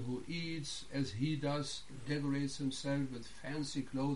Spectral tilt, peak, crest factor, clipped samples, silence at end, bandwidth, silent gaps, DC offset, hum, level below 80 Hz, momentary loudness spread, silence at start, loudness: -5.5 dB/octave; -24 dBFS; 16 dB; under 0.1%; 0 s; 11.5 kHz; none; 0.4%; none; -60 dBFS; 6 LU; 0 s; -39 LUFS